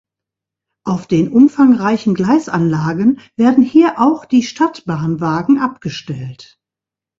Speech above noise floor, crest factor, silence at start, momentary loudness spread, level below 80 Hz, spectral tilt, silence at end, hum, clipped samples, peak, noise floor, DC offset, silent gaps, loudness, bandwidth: 73 dB; 14 dB; 0.85 s; 14 LU; -54 dBFS; -7 dB/octave; 0.75 s; none; under 0.1%; 0 dBFS; -87 dBFS; under 0.1%; none; -14 LUFS; 7.6 kHz